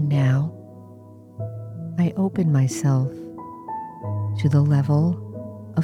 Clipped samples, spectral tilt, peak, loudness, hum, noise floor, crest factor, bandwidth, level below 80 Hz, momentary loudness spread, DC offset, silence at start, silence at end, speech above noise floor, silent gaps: under 0.1%; -8 dB/octave; -8 dBFS; -22 LUFS; none; -44 dBFS; 16 dB; 11.5 kHz; -62 dBFS; 18 LU; under 0.1%; 0 s; 0 s; 25 dB; none